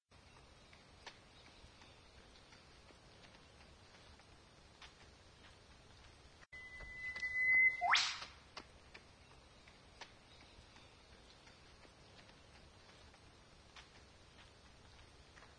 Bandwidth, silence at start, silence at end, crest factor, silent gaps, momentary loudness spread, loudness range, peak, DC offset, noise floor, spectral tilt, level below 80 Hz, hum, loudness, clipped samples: 10 kHz; 1.05 s; 0.1 s; 26 dB; none; 27 LU; 25 LU; -20 dBFS; under 0.1%; -64 dBFS; -1 dB/octave; -68 dBFS; none; -35 LUFS; under 0.1%